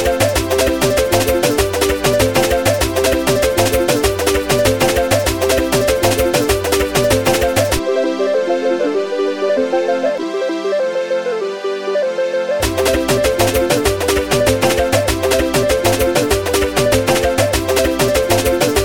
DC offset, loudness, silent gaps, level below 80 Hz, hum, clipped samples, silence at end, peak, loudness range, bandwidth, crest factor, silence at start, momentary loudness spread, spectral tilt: 0.6%; -15 LUFS; none; -30 dBFS; none; under 0.1%; 0 s; 0 dBFS; 3 LU; 19 kHz; 14 dB; 0 s; 4 LU; -4 dB/octave